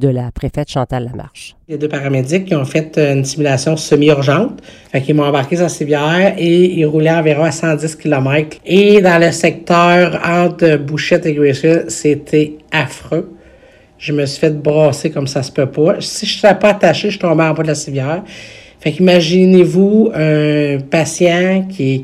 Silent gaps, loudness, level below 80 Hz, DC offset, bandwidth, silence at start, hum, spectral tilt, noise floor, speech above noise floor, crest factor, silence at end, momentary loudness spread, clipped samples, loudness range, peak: none; -13 LUFS; -44 dBFS; under 0.1%; 13.5 kHz; 0 s; none; -6 dB/octave; -44 dBFS; 31 dB; 12 dB; 0 s; 11 LU; 0.2%; 5 LU; 0 dBFS